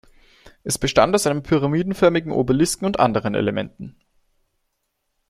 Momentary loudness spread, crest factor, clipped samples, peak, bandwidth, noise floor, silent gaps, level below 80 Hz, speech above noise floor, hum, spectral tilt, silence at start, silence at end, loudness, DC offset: 14 LU; 20 dB; under 0.1%; -2 dBFS; 15 kHz; -74 dBFS; none; -46 dBFS; 55 dB; none; -5 dB/octave; 0.45 s; 1.4 s; -20 LUFS; under 0.1%